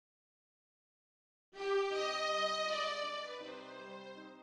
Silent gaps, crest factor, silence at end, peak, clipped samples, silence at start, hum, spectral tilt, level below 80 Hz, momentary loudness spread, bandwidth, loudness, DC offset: none; 16 dB; 0 s; -24 dBFS; under 0.1%; 1.55 s; none; -1.5 dB/octave; -80 dBFS; 15 LU; 11.5 kHz; -37 LUFS; under 0.1%